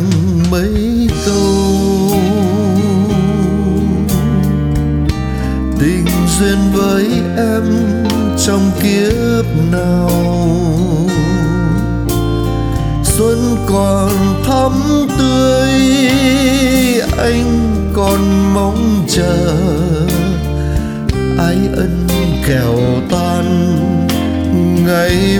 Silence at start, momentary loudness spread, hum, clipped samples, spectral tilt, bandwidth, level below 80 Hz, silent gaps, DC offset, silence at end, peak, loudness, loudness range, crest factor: 0 s; 4 LU; none; under 0.1%; -6 dB/octave; 20 kHz; -22 dBFS; none; under 0.1%; 0 s; 0 dBFS; -13 LUFS; 3 LU; 12 dB